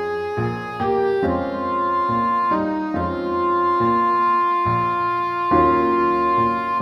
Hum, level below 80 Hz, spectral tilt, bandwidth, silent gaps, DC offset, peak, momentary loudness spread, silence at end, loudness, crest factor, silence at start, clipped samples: none; -46 dBFS; -8 dB/octave; 6.2 kHz; none; under 0.1%; -4 dBFS; 6 LU; 0 s; -20 LUFS; 16 dB; 0 s; under 0.1%